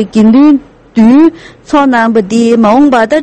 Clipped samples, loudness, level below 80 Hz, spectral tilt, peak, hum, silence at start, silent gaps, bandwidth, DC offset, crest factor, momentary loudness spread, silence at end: 1%; -7 LUFS; -42 dBFS; -6.5 dB/octave; 0 dBFS; none; 0 s; none; 8.8 kHz; under 0.1%; 6 dB; 6 LU; 0 s